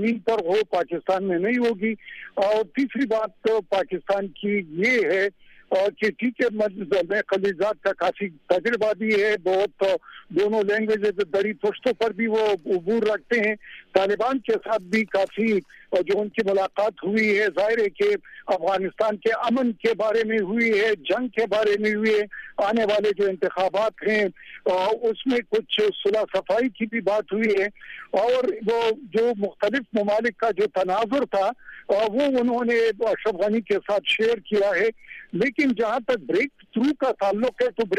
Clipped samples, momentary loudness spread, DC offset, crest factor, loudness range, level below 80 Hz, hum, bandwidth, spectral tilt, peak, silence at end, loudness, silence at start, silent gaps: under 0.1%; 4 LU; under 0.1%; 18 dB; 1 LU; -62 dBFS; none; 11 kHz; -5.5 dB/octave; -4 dBFS; 0 s; -23 LUFS; 0 s; none